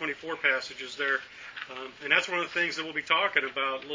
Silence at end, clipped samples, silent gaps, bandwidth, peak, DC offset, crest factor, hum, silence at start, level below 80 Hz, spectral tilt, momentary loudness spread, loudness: 0 s; under 0.1%; none; 7.6 kHz; -8 dBFS; under 0.1%; 22 dB; none; 0 s; -72 dBFS; -2 dB/octave; 14 LU; -28 LUFS